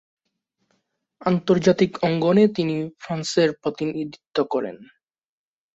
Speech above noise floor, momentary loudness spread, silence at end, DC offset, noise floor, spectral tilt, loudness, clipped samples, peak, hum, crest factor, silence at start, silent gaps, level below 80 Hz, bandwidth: over 69 dB; 11 LU; 0.9 s; under 0.1%; under -90 dBFS; -6 dB/octave; -22 LUFS; under 0.1%; -4 dBFS; none; 18 dB; 1.2 s; none; -60 dBFS; 8 kHz